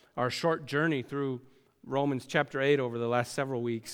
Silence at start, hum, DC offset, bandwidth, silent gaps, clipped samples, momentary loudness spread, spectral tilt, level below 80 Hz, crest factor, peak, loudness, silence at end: 0.15 s; none; under 0.1%; 16.5 kHz; none; under 0.1%; 7 LU; -5.5 dB/octave; -72 dBFS; 20 dB; -12 dBFS; -30 LUFS; 0 s